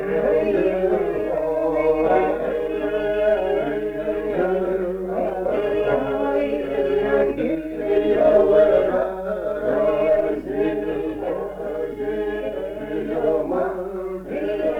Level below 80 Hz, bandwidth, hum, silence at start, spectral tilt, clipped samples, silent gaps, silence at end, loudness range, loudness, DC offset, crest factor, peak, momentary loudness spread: -44 dBFS; 6.2 kHz; none; 0 s; -7.5 dB/octave; under 0.1%; none; 0 s; 6 LU; -21 LUFS; under 0.1%; 16 dB; -4 dBFS; 9 LU